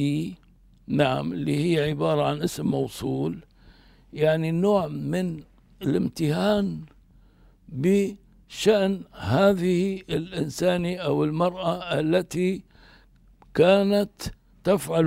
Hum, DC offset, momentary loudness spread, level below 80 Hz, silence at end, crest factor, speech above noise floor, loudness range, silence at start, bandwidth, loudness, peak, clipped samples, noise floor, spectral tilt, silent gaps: none; under 0.1%; 11 LU; -52 dBFS; 0 s; 18 dB; 31 dB; 3 LU; 0 s; 16 kHz; -24 LUFS; -6 dBFS; under 0.1%; -55 dBFS; -6.5 dB/octave; none